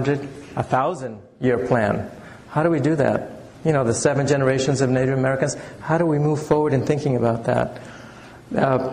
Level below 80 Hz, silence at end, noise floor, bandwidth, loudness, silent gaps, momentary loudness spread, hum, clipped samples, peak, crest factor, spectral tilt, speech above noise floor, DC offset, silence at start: -50 dBFS; 0 s; -42 dBFS; 10.5 kHz; -21 LUFS; none; 13 LU; none; under 0.1%; -6 dBFS; 16 dB; -6.5 dB/octave; 21 dB; under 0.1%; 0 s